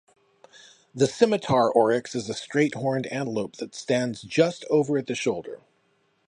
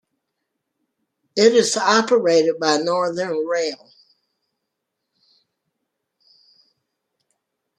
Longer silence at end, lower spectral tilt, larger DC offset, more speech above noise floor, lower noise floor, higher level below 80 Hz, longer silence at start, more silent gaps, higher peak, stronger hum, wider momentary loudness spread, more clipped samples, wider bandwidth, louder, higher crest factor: second, 0.7 s vs 4.05 s; first, -5.5 dB/octave vs -3 dB/octave; neither; second, 44 dB vs 61 dB; second, -68 dBFS vs -79 dBFS; first, -66 dBFS vs -74 dBFS; second, 0.95 s vs 1.35 s; neither; about the same, -4 dBFS vs -2 dBFS; neither; first, 13 LU vs 10 LU; neither; about the same, 10.5 kHz vs 11 kHz; second, -25 LUFS vs -18 LUFS; about the same, 20 dB vs 20 dB